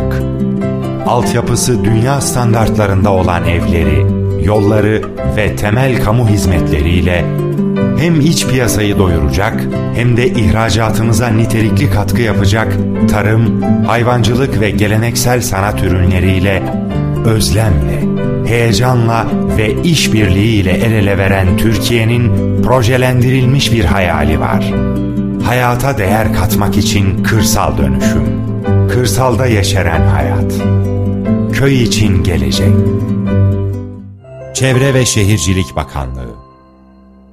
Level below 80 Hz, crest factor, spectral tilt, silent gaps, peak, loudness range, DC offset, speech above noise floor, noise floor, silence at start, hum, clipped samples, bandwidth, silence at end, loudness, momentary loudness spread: -24 dBFS; 10 dB; -6 dB/octave; none; 0 dBFS; 2 LU; under 0.1%; 31 dB; -41 dBFS; 0 s; none; under 0.1%; 15.5 kHz; 0.9 s; -12 LUFS; 5 LU